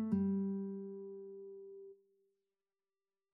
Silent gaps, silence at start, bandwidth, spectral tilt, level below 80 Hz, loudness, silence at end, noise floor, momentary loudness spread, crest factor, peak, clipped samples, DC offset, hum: none; 0 s; 2.1 kHz; -13 dB/octave; -80 dBFS; -41 LUFS; 1.4 s; under -90 dBFS; 19 LU; 18 dB; -24 dBFS; under 0.1%; under 0.1%; none